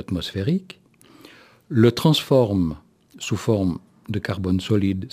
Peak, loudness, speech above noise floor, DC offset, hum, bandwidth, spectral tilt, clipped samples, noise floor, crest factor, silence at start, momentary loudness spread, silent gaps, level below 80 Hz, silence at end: -2 dBFS; -22 LUFS; 29 dB; under 0.1%; none; 15.5 kHz; -6.5 dB/octave; under 0.1%; -49 dBFS; 20 dB; 0 s; 12 LU; none; -50 dBFS; 0.05 s